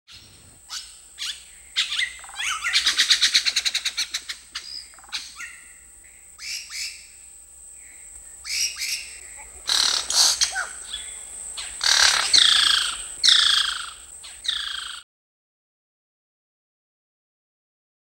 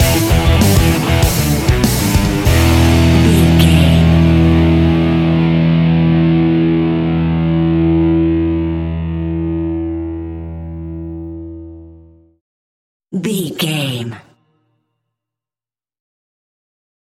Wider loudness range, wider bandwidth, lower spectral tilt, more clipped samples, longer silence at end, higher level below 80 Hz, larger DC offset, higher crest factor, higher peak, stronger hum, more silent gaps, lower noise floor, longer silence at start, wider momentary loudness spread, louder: about the same, 16 LU vs 15 LU; first, 19.5 kHz vs 17 kHz; second, 3.5 dB/octave vs -6 dB/octave; neither; about the same, 3 s vs 2.95 s; second, -58 dBFS vs -24 dBFS; neither; first, 24 dB vs 14 dB; about the same, -2 dBFS vs 0 dBFS; neither; second, none vs 12.41-13.00 s; second, -49 dBFS vs under -90 dBFS; about the same, 0.1 s vs 0 s; first, 23 LU vs 16 LU; second, -20 LUFS vs -13 LUFS